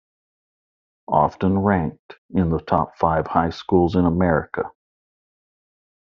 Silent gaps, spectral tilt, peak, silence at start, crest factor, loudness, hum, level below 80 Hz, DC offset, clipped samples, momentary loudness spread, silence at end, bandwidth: 1.99-2.09 s, 2.18-2.29 s; -7 dB/octave; -2 dBFS; 1.1 s; 20 dB; -21 LUFS; none; -46 dBFS; under 0.1%; under 0.1%; 9 LU; 1.45 s; 6.6 kHz